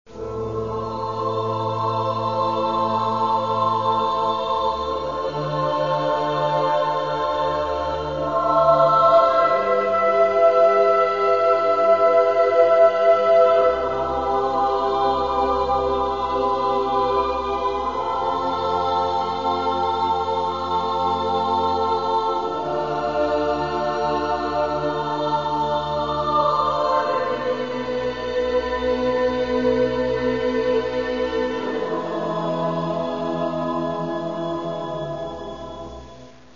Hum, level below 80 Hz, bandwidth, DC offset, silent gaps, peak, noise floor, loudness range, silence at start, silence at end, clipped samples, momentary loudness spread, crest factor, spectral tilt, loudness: none; -46 dBFS; 7.4 kHz; 0.4%; none; -4 dBFS; -43 dBFS; 7 LU; 0.1 s; 0.25 s; under 0.1%; 9 LU; 16 dB; -6 dB/octave; -21 LUFS